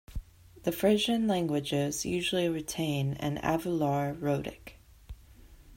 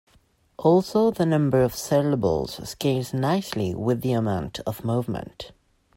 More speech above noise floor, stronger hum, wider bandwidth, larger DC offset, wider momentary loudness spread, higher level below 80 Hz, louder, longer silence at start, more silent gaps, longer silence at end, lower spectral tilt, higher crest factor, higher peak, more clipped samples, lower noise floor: second, 24 dB vs 38 dB; neither; about the same, 16 kHz vs 16.5 kHz; neither; about the same, 9 LU vs 11 LU; about the same, -50 dBFS vs -52 dBFS; second, -30 LUFS vs -24 LUFS; second, 0.1 s vs 0.6 s; neither; second, 0 s vs 0.5 s; second, -5 dB/octave vs -6.5 dB/octave; about the same, 18 dB vs 18 dB; second, -12 dBFS vs -6 dBFS; neither; second, -54 dBFS vs -61 dBFS